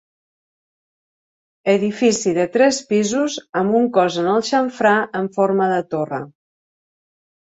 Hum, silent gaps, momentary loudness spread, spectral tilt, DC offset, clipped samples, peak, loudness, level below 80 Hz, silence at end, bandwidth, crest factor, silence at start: none; 3.49-3.53 s; 8 LU; -4.5 dB/octave; under 0.1%; under 0.1%; -2 dBFS; -18 LUFS; -64 dBFS; 1.2 s; 8.4 kHz; 18 dB; 1.65 s